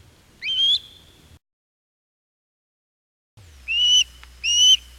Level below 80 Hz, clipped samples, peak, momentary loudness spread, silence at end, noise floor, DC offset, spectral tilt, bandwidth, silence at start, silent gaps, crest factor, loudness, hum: -52 dBFS; under 0.1%; -6 dBFS; 14 LU; 0.2 s; -50 dBFS; under 0.1%; 3.5 dB/octave; 16 kHz; 0.4 s; 1.53-3.37 s; 18 dB; -17 LUFS; none